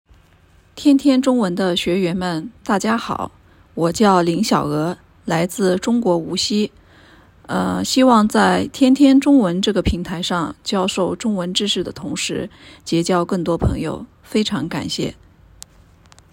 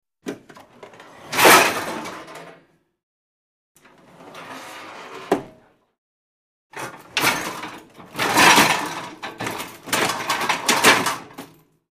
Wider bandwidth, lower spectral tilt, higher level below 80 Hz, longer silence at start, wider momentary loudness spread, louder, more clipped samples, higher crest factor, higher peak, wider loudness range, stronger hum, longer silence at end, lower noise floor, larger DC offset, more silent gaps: about the same, 16.5 kHz vs 15.5 kHz; first, -5 dB/octave vs -1.5 dB/octave; first, -40 dBFS vs -60 dBFS; first, 0.75 s vs 0.25 s; second, 12 LU vs 25 LU; about the same, -18 LUFS vs -18 LUFS; neither; about the same, 18 dB vs 22 dB; about the same, 0 dBFS vs 0 dBFS; second, 6 LU vs 15 LU; neither; first, 1.2 s vs 0.45 s; about the same, -52 dBFS vs -55 dBFS; neither; second, none vs 3.03-3.75 s, 5.98-6.70 s